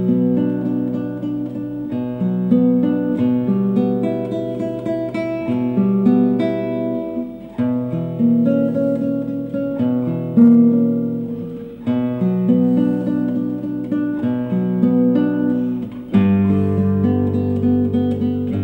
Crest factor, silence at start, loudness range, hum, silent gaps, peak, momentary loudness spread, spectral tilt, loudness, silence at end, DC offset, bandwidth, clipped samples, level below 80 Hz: 14 dB; 0 s; 3 LU; none; none; -2 dBFS; 9 LU; -10.5 dB/octave; -18 LUFS; 0 s; under 0.1%; 4.2 kHz; under 0.1%; -52 dBFS